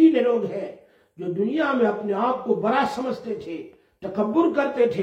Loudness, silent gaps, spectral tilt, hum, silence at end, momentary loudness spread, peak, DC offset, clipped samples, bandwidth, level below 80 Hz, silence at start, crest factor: -23 LUFS; none; -7 dB/octave; none; 0 s; 13 LU; -6 dBFS; under 0.1%; under 0.1%; 8.4 kHz; -66 dBFS; 0 s; 16 dB